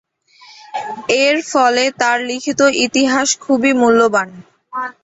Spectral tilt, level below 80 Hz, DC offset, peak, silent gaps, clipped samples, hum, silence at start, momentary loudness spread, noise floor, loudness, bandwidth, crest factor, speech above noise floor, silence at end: -2 dB/octave; -58 dBFS; under 0.1%; -2 dBFS; none; under 0.1%; none; 0.75 s; 14 LU; -46 dBFS; -14 LUFS; 8.2 kHz; 14 dB; 31 dB; 0.1 s